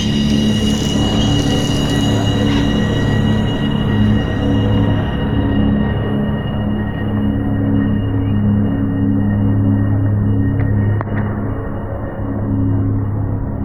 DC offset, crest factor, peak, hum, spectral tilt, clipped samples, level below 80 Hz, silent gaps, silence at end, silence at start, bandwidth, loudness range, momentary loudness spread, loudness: 0.7%; 12 dB; -4 dBFS; none; -6.5 dB/octave; under 0.1%; -26 dBFS; none; 0 s; 0 s; 11.5 kHz; 2 LU; 5 LU; -16 LUFS